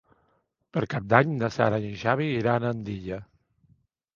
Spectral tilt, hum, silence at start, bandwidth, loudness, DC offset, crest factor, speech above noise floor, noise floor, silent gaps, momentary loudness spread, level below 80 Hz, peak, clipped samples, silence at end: -7.5 dB/octave; none; 0.75 s; 7.2 kHz; -26 LUFS; under 0.1%; 26 dB; 46 dB; -71 dBFS; none; 12 LU; -56 dBFS; 0 dBFS; under 0.1%; 0.9 s